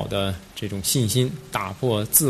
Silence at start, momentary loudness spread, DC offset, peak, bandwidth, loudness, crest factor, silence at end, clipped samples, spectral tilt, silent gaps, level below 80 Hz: 0 s; 9 LU; under 0.1%; -2 dBFS; 14 kHz; -24 LUFS; 20 dB; 0 s; under 0.1%; -4 dB/octave; none; -48 dBFS